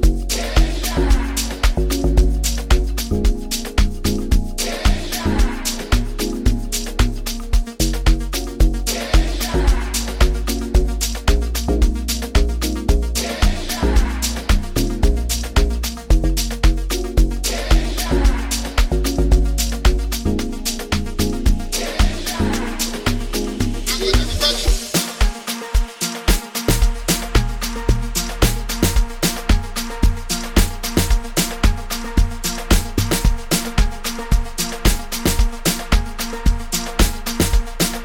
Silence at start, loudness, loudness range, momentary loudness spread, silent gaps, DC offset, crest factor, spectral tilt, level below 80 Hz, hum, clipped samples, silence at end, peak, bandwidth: 0 s; -20 LUFS; 1 LU; 4 LU; none; under 0.1%; 16 dB; -4 dB/octave; -18 dBFS; none; under 0.1%; 0 s; -2 dBFS; 18 kHz